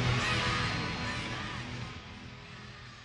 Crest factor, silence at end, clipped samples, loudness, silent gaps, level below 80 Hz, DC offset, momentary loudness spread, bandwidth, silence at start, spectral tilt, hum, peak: 16 dB; 0 s; under 0.1%; -33 LUFS; none; -50 dBFS; under 0.1%; 18 LU; 11.5 kHz; 0 s; -4.5 dB/octave; none; -18 dBFS